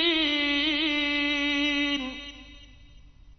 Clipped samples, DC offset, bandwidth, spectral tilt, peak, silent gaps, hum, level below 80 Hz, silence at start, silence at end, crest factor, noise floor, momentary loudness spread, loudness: under 0.1%; under 0.1%; 6.4 kHz; -2.5 dB/octave; -12 dBFS; none; none; -52 dBFS; 0 s; 0.05 s; 16 dB; -51 dBFS; 12 LU; -24 LUFS